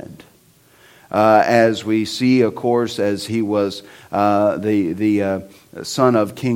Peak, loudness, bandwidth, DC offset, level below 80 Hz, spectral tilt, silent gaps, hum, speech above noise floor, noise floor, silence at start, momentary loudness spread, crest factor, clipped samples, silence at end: 0 dBFS; -17 LUFS; 16.5 kHz; under 0.1%; -60 dBFS; -6 dB/octave; none; none; 35 dB; -52 dBFS; 0.1 s; 11 LU; 18 dB; under 0.1%; 0 s